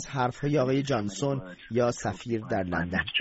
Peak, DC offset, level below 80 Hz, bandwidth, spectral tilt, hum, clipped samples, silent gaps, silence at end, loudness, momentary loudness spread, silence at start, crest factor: -14 dBFS; under 0.1%; -54 dBFS; 8 kHz; -4.5 dB/octave; none; under 0.1%; none; 0 s; -29 LUFS; 7 LU; 0 s; 16 dB